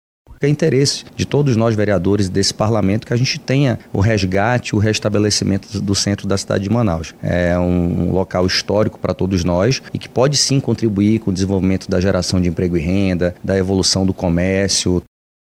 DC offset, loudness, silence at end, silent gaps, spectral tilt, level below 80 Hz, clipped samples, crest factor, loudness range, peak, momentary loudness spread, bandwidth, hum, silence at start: under 0.1%; -17 LUFS; 0.55 s; none; -5 dB/octave; -40 dBFS; under 0.1%; 16 dB; 1 LU; 0 dBFS; 5 LU; 14 kHz; none; 0.3 s